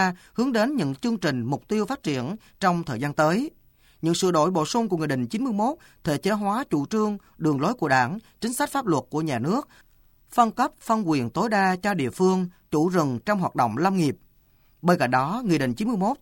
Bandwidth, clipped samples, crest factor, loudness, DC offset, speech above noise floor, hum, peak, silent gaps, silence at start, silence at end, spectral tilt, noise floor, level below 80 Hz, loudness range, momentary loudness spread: 17.5 kHz; under 0.1%; 18 dB; -24 LUFS; under 0.1%; 36 dB; none; -6 dBFS; none; 0 s; 0.05 s; -5.5 dB/octave; -59 dBFS; -58 dBFS; 2 LU; 6 LU